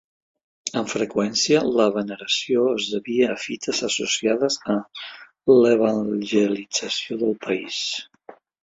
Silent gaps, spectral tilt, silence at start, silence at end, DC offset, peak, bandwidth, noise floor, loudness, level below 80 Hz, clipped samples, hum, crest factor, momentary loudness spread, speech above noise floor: none; -3.5 dB/octave; 0.65 s; 0.6 s; under 0.1%; -4 dBFS; 8 kHz; -48 dBFS; -22 LUFS; -66 dBFS; under 0.1%; none; 18 dB; 9 LU; 26 dB